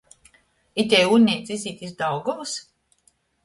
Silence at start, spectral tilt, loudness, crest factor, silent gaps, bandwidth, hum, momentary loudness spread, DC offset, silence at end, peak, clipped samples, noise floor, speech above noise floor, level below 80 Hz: 0.75 s; -4 dB/octave; -22 LUFS; 20 dB; none; 11.5 kHz; none; 15 LU; under 0.1%; 0.85 s; -4 dBFS; under 0.1%; -64 dBFS; 43 dB; -64 dBFS